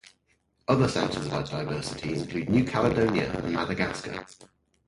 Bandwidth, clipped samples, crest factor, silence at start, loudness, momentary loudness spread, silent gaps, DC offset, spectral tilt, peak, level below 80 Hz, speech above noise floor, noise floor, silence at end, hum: 11.5 kHz; under 0.1%; 20 dB; 0.7 s; -27 LUFS; 9 LU; none; under 0.1%; -6 dB/octave; -8 dBFS; -50 dBFS; 43 dB; -70 dBFS; 0.45 s; none